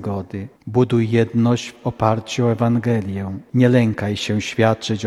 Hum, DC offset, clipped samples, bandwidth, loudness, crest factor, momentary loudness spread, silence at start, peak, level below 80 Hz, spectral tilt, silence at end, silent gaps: none; under 0.1%; under 0.1%; 11.5 kHz; -19 LUFS; 18 dB; 11 LU; 0 s; 0 dBFS; -52 dBFS; -6.5 dB/octave; 0 s; none